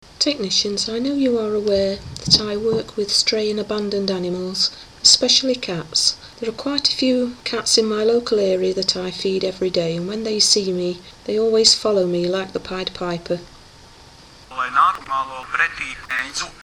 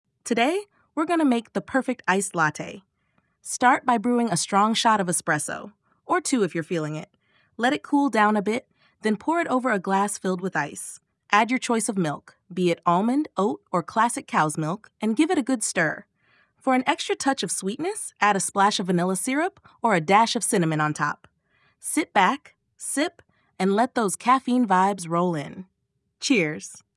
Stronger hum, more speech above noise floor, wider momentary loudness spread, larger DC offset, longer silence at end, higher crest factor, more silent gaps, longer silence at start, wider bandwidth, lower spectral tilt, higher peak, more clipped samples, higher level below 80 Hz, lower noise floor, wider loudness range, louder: neither; second, 25 dB vs 52 dB; about the same, 11 LU vs 10 LU; neither; second, 0.05 s vs 0.2 s; about the same, 20 dB vs 20 dB; neither; about the same, 0.2 s vs 0.25 s; first, 15.5 kHz vs 12 kHz; second, -2.5 dB/octave vs -4 dB/octave; first, 0 dBFS vs -4 dBFS; neither; first, -50 dBFS vs -74 dBFS; second, -45 dBFS vs -75 dBFS; first, 5 LU vs 2 LU; first, -19 LUFS vs -23 LUFS